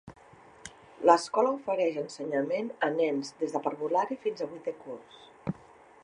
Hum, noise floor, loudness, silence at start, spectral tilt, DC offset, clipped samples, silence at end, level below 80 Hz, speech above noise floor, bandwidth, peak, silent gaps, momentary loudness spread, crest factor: none; -55 dBFS; -30 LUFS; 0.05 s; -5 dB/octave; under 0.1%; under 0.1%; 0.5 s; -70 dBFS; 26 dB; 11 kHz; -6 dBFS; none; 21 LU; 24 dB